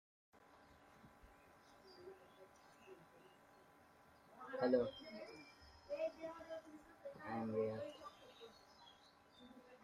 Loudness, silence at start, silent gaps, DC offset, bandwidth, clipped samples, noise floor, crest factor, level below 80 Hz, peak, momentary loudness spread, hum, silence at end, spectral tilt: -45 LUFS; 0.35 s; none; under 0.1%; 15 kHz; under 0.1%; -68 dBFS; 24 dB; -78 dBFS; -24 dBFS; 24 LU; none; 0 s; -6.5 dB/octave